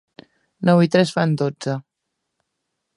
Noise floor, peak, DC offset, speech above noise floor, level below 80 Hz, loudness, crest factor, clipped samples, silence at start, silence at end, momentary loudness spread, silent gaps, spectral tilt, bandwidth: -78 dBFS; -2 dBFS; under 0.1%; 61 dB; -66 dBFS; -19 LUFS; 20 dB; under 0.1%; 0.6 s; 1.15 s; 12 LU; none; -7 dB/octave; 11.5 kHz